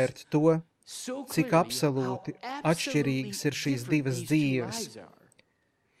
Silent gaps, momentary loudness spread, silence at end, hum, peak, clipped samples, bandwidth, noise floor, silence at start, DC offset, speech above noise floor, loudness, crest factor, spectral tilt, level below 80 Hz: none; 12 LU; 0.95 s; none; -10 dBFS; under 0.1%; 15 kHz; -73 dBFS; 0 s; under 0.1%; 44 dB; -29 LUFS; 18 dB; -5.5 dB/octave; -70 dBFS